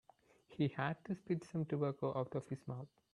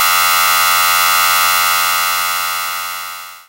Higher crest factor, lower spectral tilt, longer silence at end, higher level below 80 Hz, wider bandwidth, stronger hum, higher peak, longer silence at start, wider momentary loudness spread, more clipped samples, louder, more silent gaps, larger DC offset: first, 20 dB vs 14 dB; first, -8 dB/octave vs 2.5 dB/octave; first, 0.3 s vs 0.1 s; second, -76 dBFS vs -60 dBFS; second, 11 kHz vs 16.5 kHz; neither; second, -22 dBFS vs 0 dBFS; first, 0.5 s vs 0 s; about the same, 9 LU vs 11 LU; neither; second, -41 LUFS vs -12 LUFS; neither; neither